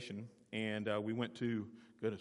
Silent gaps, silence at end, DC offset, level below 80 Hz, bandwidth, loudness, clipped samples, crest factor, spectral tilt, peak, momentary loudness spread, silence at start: none; 0 s; under 0.1%; -80 dBFS; 11 kHz; -41 LUFS; under 0.1%; 18 dB; -6.5 dB/octave; -24 dBFS; 10 LU; 0 s